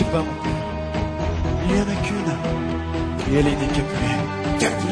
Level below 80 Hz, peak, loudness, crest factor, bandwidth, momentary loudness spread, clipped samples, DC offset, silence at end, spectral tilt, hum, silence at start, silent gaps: -32 dBFS; -6 dBFS; -23 LUFS; 16 dB; 11 kHz; 6 LU; under 0.1%; under 0.1%; 0 s; -6 dB/octave; none; 0 s; none